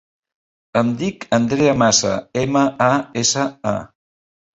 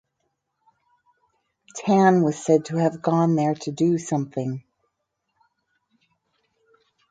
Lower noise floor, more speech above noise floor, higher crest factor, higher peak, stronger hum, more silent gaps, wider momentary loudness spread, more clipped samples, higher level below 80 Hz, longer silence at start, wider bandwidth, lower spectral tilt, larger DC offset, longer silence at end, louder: first, under -90 dBFS vs -77 dBFS; first, over 72 dB vs 56 dB; about the same, 18 dB vs 20 dB; first, -2 dBFS vs -6 dBFS; neither; neither; second, 9 LU vs 13 LU; neither; first, -52 dBFS vs -70 dBFS; second, 0.75 s vs 1.75 s; second, 8.2 kHz vs 9.2 kHz; second, -4 dB/octave vs -7 dB/octave; neither; second, 0.75 s vs 2.5 s; first, -18 LUFS vs -22 LUFS